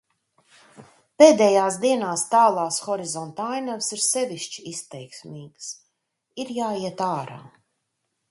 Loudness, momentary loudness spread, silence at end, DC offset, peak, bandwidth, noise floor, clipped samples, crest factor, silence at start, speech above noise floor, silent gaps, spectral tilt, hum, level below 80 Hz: -21 LUFS; 23 LU; 0.85 s; under 0.1%; 0 dBFS; 11.5 kHz; -77 dBFS; under 0.1%; 24 dB; 0.8 s; 55 dB; none; -3.5 dB/octave; none; -72 dBFS